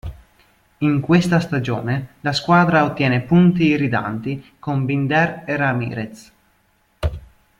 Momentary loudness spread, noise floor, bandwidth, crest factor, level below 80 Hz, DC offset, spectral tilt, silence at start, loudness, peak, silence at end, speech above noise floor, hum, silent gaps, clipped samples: 13 LU; -61 dBFS; 11 kHz; 18 dB; -42 dBFS; under 0.1%; -7 dB/octave; 0.05 s; -19 LUFS; -2 dBFS; 0.4 s; 43 dB; none; none; under 0.1%